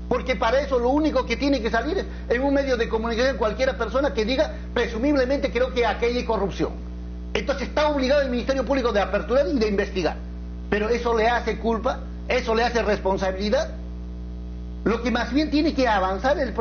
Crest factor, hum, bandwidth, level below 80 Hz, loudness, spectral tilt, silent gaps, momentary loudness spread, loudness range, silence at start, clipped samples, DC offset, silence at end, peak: 18 dB; 60 Hz at -35 dBFS; 6.8 kHz; -34 dBFS; -23 LUFS; -4 dB/octave; none; 8 LU; 2 LU; 0 s; under 0.1%; under 0.1%; 0 s; -6 dBFS